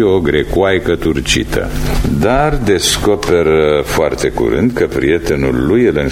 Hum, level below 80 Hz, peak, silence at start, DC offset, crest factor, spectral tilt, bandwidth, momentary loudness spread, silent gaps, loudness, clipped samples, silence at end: none; -24 dBFS; 0 dBFS; 0 s; under 0.1%; 12 dB; -5 dB/octave; 16.5 kHz; 4 LU; none; -13 LUFS; under 0.1%; 0 s